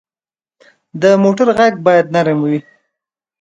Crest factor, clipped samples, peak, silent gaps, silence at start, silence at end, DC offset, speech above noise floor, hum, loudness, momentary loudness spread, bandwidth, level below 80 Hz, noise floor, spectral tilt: 14 dB; under 0.1%; 0 dBFS; none; 0.95 s; 0.8 s; under 0.1%; over 78 dB; none; -13 LUFS; 8 LU; 9.2 kHz; -58 dBFS; under -90 dBFS; -6.5 dB/octave